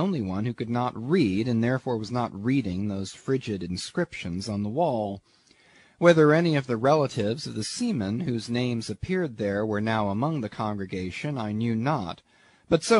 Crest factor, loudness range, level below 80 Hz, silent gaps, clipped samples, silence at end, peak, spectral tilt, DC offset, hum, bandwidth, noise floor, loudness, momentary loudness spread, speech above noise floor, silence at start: 22 dB; 5 LU; -58 dBFS; none; under 0.1%; 0 s; -4 dBFS; -6 dB/octave; under 0.1%; none; 11 kHz; -58 dBFS; -26 LUFS; 9 LU; 32 dB; 0 s